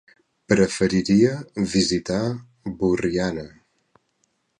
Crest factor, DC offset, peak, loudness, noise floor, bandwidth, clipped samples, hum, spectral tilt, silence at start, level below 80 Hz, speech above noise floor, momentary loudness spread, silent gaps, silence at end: 20 dB; under 0.1%; -4 dBFS; -22 LUFS; -70 dBFS; 11 kHz; under 0.1%; none; -5.5 dB/octave; 0.5 s; -48 dBFS; 49 dB; 14 LU; none; 1.1 s